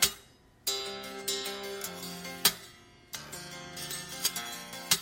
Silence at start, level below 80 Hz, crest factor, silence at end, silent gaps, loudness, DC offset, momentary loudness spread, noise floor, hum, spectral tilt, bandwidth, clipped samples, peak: 0 s; -64 dBFS; 28 dB; 0 s; none; -33 LUFS; under 0.1%; 15 LU; -58 dBFS; none; -0.5 dB/octave; 16.5 kHz; under 0.1%; -8 dBFS